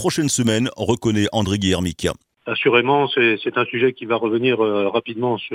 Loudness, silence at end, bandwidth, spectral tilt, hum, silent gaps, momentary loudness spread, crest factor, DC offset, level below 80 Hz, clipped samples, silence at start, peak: -19 LUFS; 0 s; 16 kHz; -4.5 dB/octave; none; none; 7 LU; 18 dB; under 0.1%; -50 dBFS; under 0.1%; 0 s; 0 dBFS